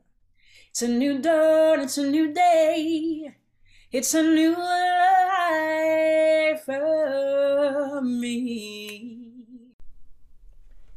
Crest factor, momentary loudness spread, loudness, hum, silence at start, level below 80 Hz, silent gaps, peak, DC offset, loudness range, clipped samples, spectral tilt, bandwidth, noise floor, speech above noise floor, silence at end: 12 dB; 13 LU; -22 LUFS; none; 0.75 s; -58 dBFS; 9.73-9.79 s; -10 dBFS; under 0.1%; 6 LU; under 0.1%; -2.5 dB/octave; 15 kHz; -60 dBFS; 38 dB; 0 s